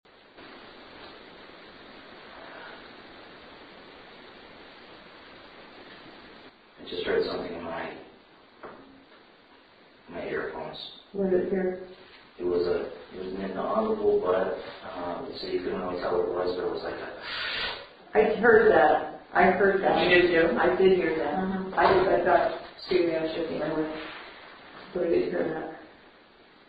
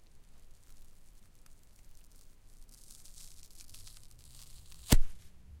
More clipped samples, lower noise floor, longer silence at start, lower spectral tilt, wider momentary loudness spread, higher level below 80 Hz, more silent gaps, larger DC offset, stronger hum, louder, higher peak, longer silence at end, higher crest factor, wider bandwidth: neither; about the same, -56 dBFS vs -55 dBFS; second, 0.4 s vs 4.9 s; first, -8 dB/octave vs -4 dB/octave; second, 26 LU vs 31 LU; second, -56 dBFS vs -38 dBFS; neither; neither; neither; first, -26 LUFS vs -33 LUFS; about the same, -8 dBFS vs -10 dBFS; first, 0.8 s vs 0.4 s; about the same, 20 dB vs 24 dB; second, 5 kHz vs 16.5 kHz